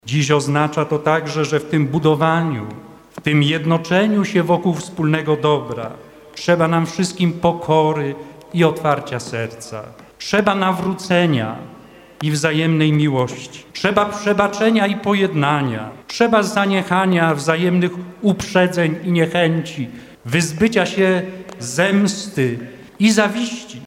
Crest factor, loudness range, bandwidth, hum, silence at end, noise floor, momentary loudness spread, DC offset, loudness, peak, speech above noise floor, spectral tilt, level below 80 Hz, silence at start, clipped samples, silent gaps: 18 dB; 3 LU; 15.5 kHz; none; 0 s; -42 dBFS; 12 LU; under 0.1%; -18 LUFS; 0 dBFS; 25 dB; -5.5 dB/octave; -54 dBFS; 0.05 s; under 0.1%; none